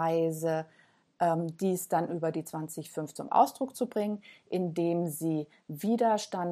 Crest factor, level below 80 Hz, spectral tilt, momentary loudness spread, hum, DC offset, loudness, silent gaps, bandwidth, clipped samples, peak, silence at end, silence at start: 20 dB; -80 dBFS; -6 dB/octave; 11 LU; none; under 0.1%; -31 LUFS; none; 15 kHz; under 0.1%; -10 dBFS; 0 s; 0 s